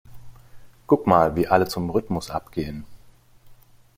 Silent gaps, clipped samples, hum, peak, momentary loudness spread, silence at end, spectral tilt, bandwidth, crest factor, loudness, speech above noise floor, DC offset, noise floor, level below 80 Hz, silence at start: none; under 0.1%; none; -2 dBFS; 12 LU; 0.45 s; -6.5 dB/octave; 16.5 kHz; 22 dB; -22 LUFS; 29 dB; under 0.1%; -51 dBFS; -48 dBFS; 0.1 s